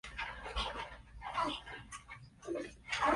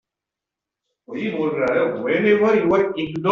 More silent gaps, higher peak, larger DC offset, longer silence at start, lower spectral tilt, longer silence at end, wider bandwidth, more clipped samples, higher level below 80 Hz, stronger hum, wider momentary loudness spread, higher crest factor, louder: neither; second, -20 dBFS vs -4 dBFS; neither; second, 0.05 s vs 1.1 s; second, -3.5 dB/octave vs -5 dB/octave; about the same, 0 s vs 0 s; first, 11.5 kHz vs 7 kHz; neither; first, -54 dBFS vs -60 dBFS; neither; about the same, 12 LU vs 10 LU; about the same, 20 dB vs 16 dB; second, -41 LUFS vs -19 LUFS